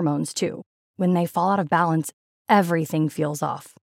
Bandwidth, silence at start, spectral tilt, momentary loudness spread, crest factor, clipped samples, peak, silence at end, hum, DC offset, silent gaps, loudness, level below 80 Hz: 16.5 kHz; 0 s; -6 dB/octave; 13 LU; 20 dB; under 0.1%; -4 dBFS; 0.3 s; none; under 0.1%; 0.66-0.94 s, 2.13-2.45 s; -23 LUFS; -82 dBFS